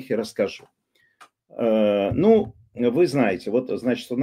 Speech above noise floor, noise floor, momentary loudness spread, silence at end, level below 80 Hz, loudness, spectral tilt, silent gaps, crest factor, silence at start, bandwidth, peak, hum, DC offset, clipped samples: 33 dB; -55 dBFS; 9 LU; 0 s; -54 dBFS; -22 LUFS; -7 dB/octave; none; 18 dB; 0 s; 15 kHz; -6 dBFS; none; under 0.1%; under 0.1%